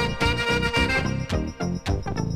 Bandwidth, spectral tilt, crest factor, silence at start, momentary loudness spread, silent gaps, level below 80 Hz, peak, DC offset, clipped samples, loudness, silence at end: 15.5 kHz; -5 dB/octave; 16 dB; 0 s; 7 LU; none; -34 dBFS; -8 dBFS; under 0.1%; under 0.1%; -24 LUFS; 0 s